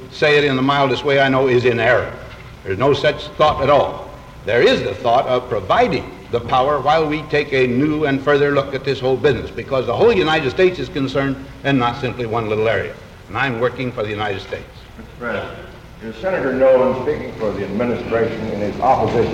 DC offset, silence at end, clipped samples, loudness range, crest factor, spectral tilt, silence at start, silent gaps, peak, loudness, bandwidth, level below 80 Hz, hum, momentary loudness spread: under 0.1%; 0 s; under 0.1%; 6 LU; 16 dB; -6.5 dB/octave; 0 s; none; -2 dBFS; -17 LUFS; 11.5 kHz; -42 dBFS; none; 13 LU